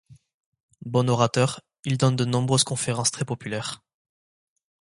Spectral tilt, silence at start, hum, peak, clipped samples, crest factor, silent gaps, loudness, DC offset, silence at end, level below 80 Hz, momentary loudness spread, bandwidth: -4.5 dB/octave; 0.1 s; none; -4 dBFS; under 0.1%; 22 dB; 0.34-0.40 s, 0.46-0.52 s, 0.60-0.68 s; -24 LUFS; under 0.1%; 1.2 s; -62 dBFS; 12 LU; 11.5 kHz